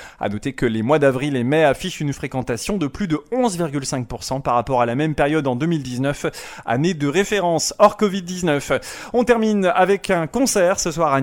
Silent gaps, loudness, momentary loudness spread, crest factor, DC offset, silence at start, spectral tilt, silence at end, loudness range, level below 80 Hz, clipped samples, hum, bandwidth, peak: none; -20 LUFS; 8 LU; 18 dB; under 0.1%; 0 s; -5 dB/octave; 0 s; 3 LU; -44 dBFS; under 0.1%; none; 17 kHz; 0 dBFS